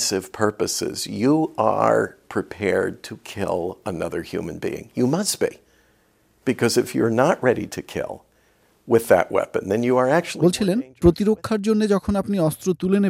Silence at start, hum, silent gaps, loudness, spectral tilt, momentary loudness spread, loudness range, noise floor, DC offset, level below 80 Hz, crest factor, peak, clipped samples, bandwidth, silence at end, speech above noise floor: 0 s; none; none; -22 LUFS; -5 dB/octave; 11 LU; 6 LU; -61 dBFS; under 0.1%; -46 dBFS; 20 dB; -2 dBFS; under 0.1%; 16 kHz; 0 s; 40 dB